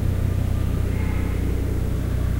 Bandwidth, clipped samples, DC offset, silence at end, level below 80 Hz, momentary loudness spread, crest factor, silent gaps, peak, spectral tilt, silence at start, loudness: 16 kHz; under 0.1%; under 0.1%; 0 s; -26 dBFS; 1 LU; 12 dB; none; -10 dBFS; -7.5 dB/octave; 0 s; -24 LUFS